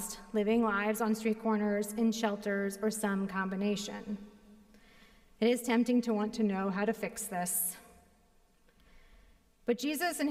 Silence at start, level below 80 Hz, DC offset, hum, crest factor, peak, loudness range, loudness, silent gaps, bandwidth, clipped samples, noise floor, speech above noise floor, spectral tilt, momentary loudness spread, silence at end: 0 s; -64 dBFS; under 0.1%; none; 16 dB; -18 dBFS; 5 LU; -32 LUFS; none; 16 kHz; under 0.1%; -66 dBFS; 34 dB; -4.5 dB/octave; 8 LU; 0 s